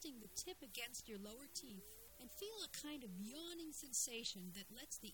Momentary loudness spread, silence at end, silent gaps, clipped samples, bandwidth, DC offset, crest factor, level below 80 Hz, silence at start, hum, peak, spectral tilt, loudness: 12 LU; 0 s; none; under 0.1%; 17.5 kHz; under 0.1%; 22 dB; -74 dBFS; 0 s; none; -28 dBFS; -2 dB/octave; -49 LUFS